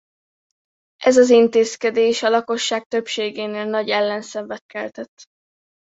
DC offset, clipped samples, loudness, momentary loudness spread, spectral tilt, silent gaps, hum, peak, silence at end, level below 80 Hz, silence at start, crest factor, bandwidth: under 0.1%; under 0.1%; -18 LUFS; 17 LU; -3 dB/octave; 2.86-2.90 s, 4.61-4.69 s, 5.08-5.17 s; none; -2 dBFS; 0.6 s; -68 dBFS; 1 s; 18 dB; 8 kHz